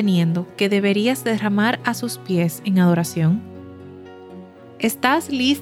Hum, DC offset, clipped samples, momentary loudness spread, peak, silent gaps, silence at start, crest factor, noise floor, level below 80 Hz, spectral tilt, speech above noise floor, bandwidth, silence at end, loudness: none; under 0.1%; under 0.1%; 22 LU; -2 dBFS; none; 0 s; 18 dB; -40 dBFS; -66 dBFS; -5.5 dB/octave; 21 dB; 16 kHz; 0 s; -20 LUFS